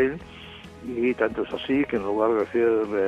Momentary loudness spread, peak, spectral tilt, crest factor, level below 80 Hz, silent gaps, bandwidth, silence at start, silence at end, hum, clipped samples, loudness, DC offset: 17 LU; -8 dBFS; -7 dB/octave; 16 dB; -54 dBFS; none; 9.2 kHz; 0 s; 0 s; none; under 0.1%; -24 LUFS; under 0.1%